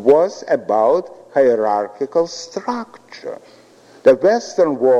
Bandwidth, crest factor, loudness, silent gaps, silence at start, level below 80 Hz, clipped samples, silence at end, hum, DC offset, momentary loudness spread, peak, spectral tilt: 8.6 kHz; 16 dB; -17 LUFS; none; 0 s; -66 dBFS; under 0.1%; 0 s; none; under 0.1%; 18 LU; -2 dBFS; -5 dB/octave